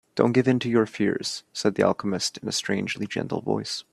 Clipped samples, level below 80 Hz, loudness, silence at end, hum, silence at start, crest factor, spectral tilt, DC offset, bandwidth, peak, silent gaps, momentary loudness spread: under 0.1%; -64 dBFS; -25 LUFS; 0.1 s; none; 0.15 s; 22 dB; -4.5 dB/octave; under 0.1%; 13 kHz; -2 dBFS; none; 7 LU